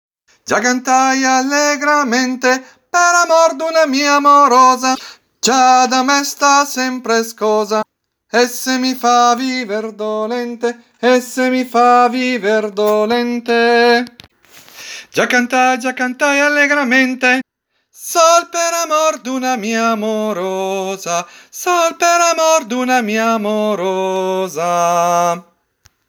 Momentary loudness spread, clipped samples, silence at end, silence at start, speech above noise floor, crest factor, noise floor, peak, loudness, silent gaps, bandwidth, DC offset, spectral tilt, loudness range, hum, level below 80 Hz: 9 LU; under 0.1%; 0.7 s; 0.45 s; 53 dB; 14 dB; -67 dBFS; 0 dBFS; -14 LUFS; none; over 20 kHz; under 0.1%; -2.5 dB/octave; 4 LU; none; -72 dBFS